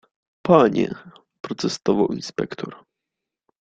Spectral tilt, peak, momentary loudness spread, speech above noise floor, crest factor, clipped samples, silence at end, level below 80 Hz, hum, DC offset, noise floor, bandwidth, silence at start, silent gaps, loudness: -6 dB/octave; -2 dBFS; 19 LU; 64 dB; 22 dB; under 0.1%; 0.85 s; -58 dBFS; none; under 0.1%; -85 dBFS; 9.2 kHz; 0.45 s; 1.40-1.44 s; -21 LUFS